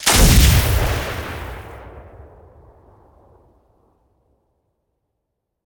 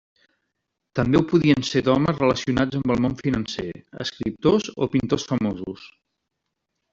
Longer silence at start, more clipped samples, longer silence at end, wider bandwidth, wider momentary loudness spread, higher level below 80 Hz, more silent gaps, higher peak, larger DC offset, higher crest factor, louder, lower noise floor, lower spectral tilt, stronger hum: second, 0 s vs 0.95 s; neither; first, 3.65 s vs 1.05 s; first, 19.5 kHz vs 7.8 kHz; first, 26 LU vs 13 LU; first, -24 dBFS vs -48 dBFS; neither; first, 0 dBFS vs -4 dBFS; neither; about the same, 20 dB vs 18 dB; first, -16 LUFS vs -22 LUFS; about the same, -77 dBFS vs -80 dBFS; second, -3.5 dB/octave vs -6.5 dB/octave; neither